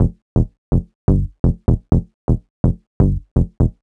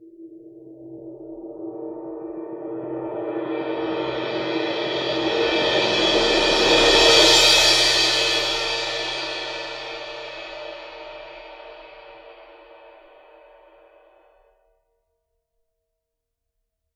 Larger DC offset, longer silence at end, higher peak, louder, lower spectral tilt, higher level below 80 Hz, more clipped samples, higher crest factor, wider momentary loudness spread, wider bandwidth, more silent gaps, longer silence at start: neither; second, 0.1 s vs 4.05 s; about the same, 0 dBFS vs -2 dBFS; about the same, -20 LUFS vs -18 LUFS; first, -12 dB/octave vs -1.5 dB/octave; first, -22 dBFS vs -46 dBFS; neither; second, 16 dB vs 22 dB; second, 4 LU vs 25 LU; second, 2 kHz vs 18 kHz; first, 0.22-0.36 s, 0.58-0.72 s, 0.95-1.08 s, 1.39-1.44 s, 2.14-2.28 s, 2.50-2.64 s, 2.87-3.00 s, 3.31-3.36 s vs none; about the same, 0 s vs 0 s